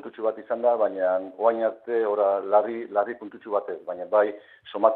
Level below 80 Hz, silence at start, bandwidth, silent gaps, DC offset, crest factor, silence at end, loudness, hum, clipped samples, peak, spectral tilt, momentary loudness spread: -78 dBFS; 0.05 s; 4.2 kHz; none; under 0.1%; 20 dB; 0 s; -25 LUFS; none; under 0.1%; -4 dBFS; -8.5 dB/octave; 10 LU